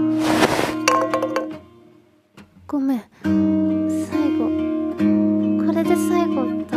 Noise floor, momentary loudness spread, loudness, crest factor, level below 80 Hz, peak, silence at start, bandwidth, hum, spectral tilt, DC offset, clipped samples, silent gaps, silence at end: -53 dBFS; 7 LU; -20 LUFS; 18 dB; -54 dBFS; -2 dBFS; 0 s; 15.5 kHz; none; -5.5 dB/octave; under 0.1%; under 0.1%; none; 0 s